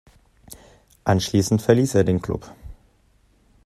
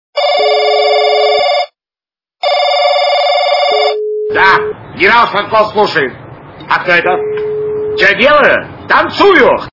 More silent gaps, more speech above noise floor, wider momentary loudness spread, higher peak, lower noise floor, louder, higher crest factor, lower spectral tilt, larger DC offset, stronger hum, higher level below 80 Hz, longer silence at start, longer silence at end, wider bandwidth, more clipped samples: neither; second, 40 dB vs over 81 dB; first, 13 LU vs 10 LU; about the same, -2 dBFS vs 0 dBFS; second, -59 dBFS vs under -90 dBFS; second, -21 LUFS vs -10 LUFS; first, 22 dB vs 10 dB; first, -6 dB/octave vs -4 dB/octave; neither; neither; about the same, -48 dBFS vs -46 dBFS; first, 0.5 s vs 0.15 s; first, 0.95 s vs 0.05 s; first, 14 kHz vs 6 kHz; second, under 0.1% vs 0.5%